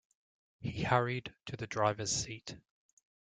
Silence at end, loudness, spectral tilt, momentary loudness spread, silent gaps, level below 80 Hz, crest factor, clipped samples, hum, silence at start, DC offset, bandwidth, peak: 0.8 s; -35 LUFS; -4 dB/octave; 15 LU; none; -62 dBFS; 26 dB; under 0.1%; none; 0.6 s; under 0.1%; 9.6 kHz; -12 dBFS